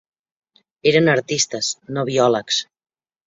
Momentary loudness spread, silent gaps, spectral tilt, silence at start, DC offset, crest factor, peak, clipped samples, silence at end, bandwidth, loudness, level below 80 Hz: 8 LU; none; -3.5 dB/octave; 0.85 s; under 0.1%; 18 dB; -2 dBFS; under 0.1%; 0.65 s; 7.8 kHz; -19 LUFS; -62 dBFS